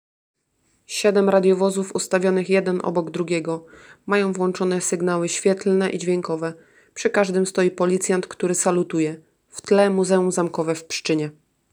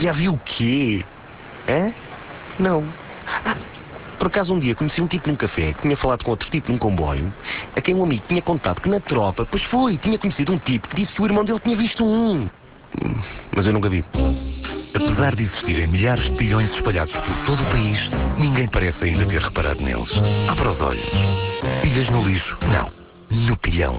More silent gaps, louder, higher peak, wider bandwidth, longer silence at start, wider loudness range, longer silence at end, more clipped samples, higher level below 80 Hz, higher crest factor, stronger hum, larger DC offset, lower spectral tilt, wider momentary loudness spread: neither; about the same, -21 LUFS vs -21 LUFS; about the same, -4 dBFS vs -6 dBFS; first, over 20 kHz vs 4 kHz; first, 0.9 s vs 0 s; about the same, 2 LU vs 3 LU; first, 0.4 s vs 0 s; neither; second, -70 dBFS vs -30 dBFS; about the same, 18 dB vs 16 dB; neither; neither; second, -5 dB/octave vs -11 dB/octave; about the same, 10 LU vs 8 LU